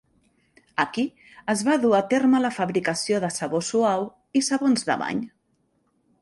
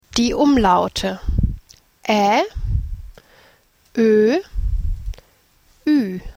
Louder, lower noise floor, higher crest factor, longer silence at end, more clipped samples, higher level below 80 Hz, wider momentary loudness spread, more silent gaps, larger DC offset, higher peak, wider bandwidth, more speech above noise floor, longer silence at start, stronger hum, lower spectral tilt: second, -23 LUFS vs -19 LUFS; first, -69 dBFS vs -56 dBFS; about the same, 18 dB vs 18 dB; first, 0.95 s vs 0.05 s; neither; second, -66 dBFS vs -28 dBFS; second, 9 LU vs 15 LU; neither; neither; second, -6 dBFS vs -2 dBFS; second, 11.5 kHz vs 16.5 kHz; first, 46 dB vs 39 dB; first, 0.8 s vs 0.15 s; neither; second, -4 dB/octave vs -5.5 dB/octave